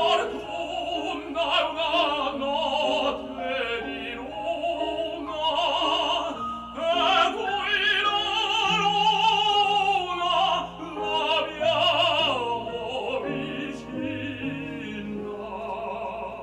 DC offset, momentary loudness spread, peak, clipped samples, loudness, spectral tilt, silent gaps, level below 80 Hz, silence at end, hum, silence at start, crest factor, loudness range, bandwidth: under 0.1%; 12 LU; -10 dBFS; under 0.1%; -25 LUFS; -3.5 dB/octave; none; -54 dBFS; 0 s; 60 Hz at -55 dBFS; 0 s; 16 dB; 7 LU; 14 kHz